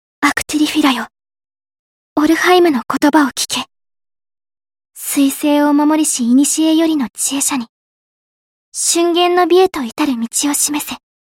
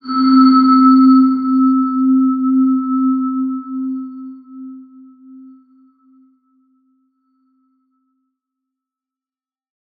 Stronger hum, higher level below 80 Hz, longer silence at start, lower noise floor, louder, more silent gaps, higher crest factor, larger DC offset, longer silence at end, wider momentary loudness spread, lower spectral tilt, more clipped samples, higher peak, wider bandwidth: neither; first, -56 dBFS vs -80 dBFS; first, 0.2 s vs 0.05 s; about the same, under -90 dBFS vs under -90 dBFS; about the same, -14 LUFS vs -13 LUFS; first, 1.79-2.16 s, 7.69-8.72 s vs none; about the same, 14 dB vs 14 dB; neither; second, 0.3 s vs 5.15 s; second, 10 LU vs 24 LU; second, -1.5 dB/octave vs -8 dB/octave; neither; about the same, 0 dBFS vs -2 dBFS; first, 17 kHz vs 4.8 kHz